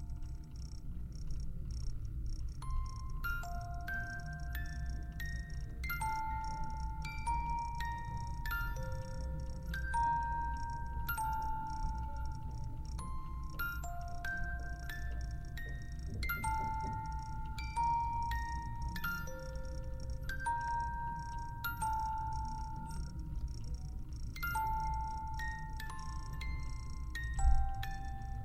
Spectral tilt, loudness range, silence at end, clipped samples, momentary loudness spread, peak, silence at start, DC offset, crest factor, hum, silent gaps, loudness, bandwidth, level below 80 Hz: -5 dB/octave; 4 LU; 0 s; under 0.1%; 9 LU; -18 dBFS; 0 s; under 0.1%; 20 dB; none; none; -41 LUFS; 15.5 kHz; -42 dBFS